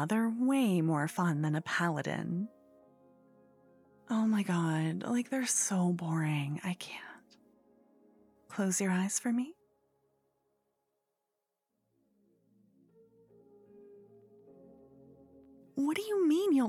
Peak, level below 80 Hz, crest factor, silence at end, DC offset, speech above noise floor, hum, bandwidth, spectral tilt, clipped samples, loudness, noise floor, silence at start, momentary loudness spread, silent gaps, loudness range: -18 dBFS; -88 dBFS; 16 dB; 0 s; under 0.1%; 55 dB; none; 16 kHz; -5 dB/octave; under 0.1%; -32 LUFS; -86 dBFS; 0 s; 10 LU; none; 6 LU